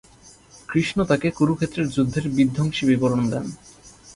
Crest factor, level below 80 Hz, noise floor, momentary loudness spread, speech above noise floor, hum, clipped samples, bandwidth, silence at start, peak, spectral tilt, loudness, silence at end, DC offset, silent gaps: 18 dB; -48 dBFS; -50 dBFS; 6 LU; 29 dB; none; under 0.1%; 11.5 kHz; 0.25 s; -6 dBFS; -6.5 dB/octave; -22 LUFS; 0.05 s; under 0.1%; none